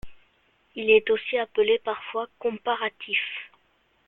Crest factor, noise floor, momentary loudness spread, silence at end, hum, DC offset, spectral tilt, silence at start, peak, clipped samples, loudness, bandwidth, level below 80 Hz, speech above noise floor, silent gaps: 20 dB; -66 dBFS; 13 LU; 0.6 s; none; under 0.1%; -6 dB/octave; 0.05 s; -6 dBFS; under 0.1%; -25 LUFS; 4.1 kHz; -60 dBFS; 41 dB; none